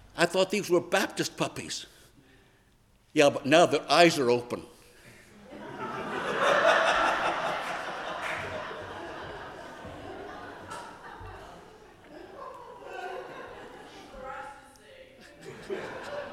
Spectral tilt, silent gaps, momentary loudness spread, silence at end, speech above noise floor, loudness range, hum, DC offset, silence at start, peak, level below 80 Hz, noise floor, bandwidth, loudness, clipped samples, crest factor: -3.5 dB/octave; none; 23 LU; 0 s; 38 dB; 18 LU; none; under 0.1%; 0.05 s; -6 dBFS; -62 dBFS; -63 dBFS; 15.5 kHz; -27 LUFS; under 0.1%; 24 dB